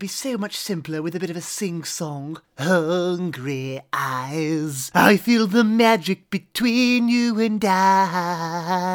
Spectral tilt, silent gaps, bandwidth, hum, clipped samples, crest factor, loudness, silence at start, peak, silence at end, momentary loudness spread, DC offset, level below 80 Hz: -4.5 dB/octave; none; over 20 kHz; none; under 0.1%; 20 dB; -21 LUFS; 0 s; 0 dBFS; 0 s; 11 LU; under 0.1%; -66 dBFS